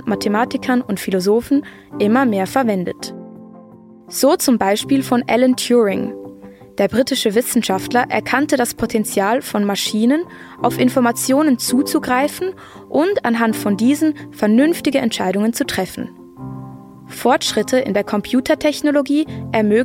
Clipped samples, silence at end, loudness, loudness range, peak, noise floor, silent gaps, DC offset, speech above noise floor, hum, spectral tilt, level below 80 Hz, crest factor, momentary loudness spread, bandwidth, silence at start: under 0.1%; 0 s; -17 LUFS; 2 LU; -2 dBFS; -41 dBFS; none; under 0.1%; 25 dB; none; -4.5 dB/octave; -54 dBFS; 16 dB; 13 LU; 16.5 kHz; 0 s